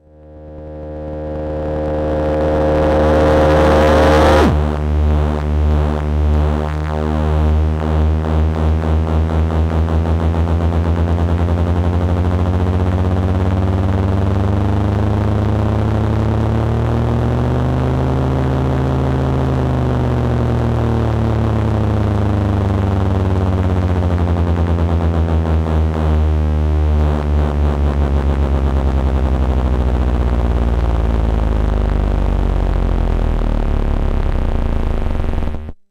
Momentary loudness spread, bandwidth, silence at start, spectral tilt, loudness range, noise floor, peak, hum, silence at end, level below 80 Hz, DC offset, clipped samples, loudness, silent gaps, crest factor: 5 LU; 8.6 kHz; 0.25 s; -8.5 dB/octave; 4 LU; -37 dBFS; -2 dBFS; none; 0.15 s; -20 dBFS; under 0.1%; under 0.1%; -16 LUFS; none; 14 dB